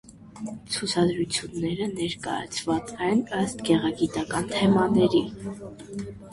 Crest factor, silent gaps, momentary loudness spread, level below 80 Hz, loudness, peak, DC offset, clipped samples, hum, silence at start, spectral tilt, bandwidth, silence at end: 18 dB; none; 16 LU; -54 dBFS; -25 LUFS; -8 dBFS; under 0.1%; under 0.1%; none; 0.1 s; -5 dB/octave; 11.5 kHz; 0 s